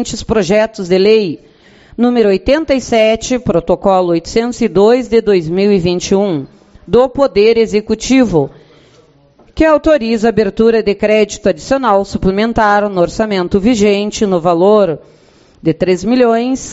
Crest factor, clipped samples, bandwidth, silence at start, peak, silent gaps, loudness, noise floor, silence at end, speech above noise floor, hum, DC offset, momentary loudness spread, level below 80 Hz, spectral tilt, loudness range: 12 dB; under 0.1%; 8.2 kHz; 0 s; 0 dBFS; none; -12 LUFS; -47 dBFS; 0 s; 35 dB; none; under 0.1%; 6 LU; -36 dBFS; -5.5 dB/octave; 1 LU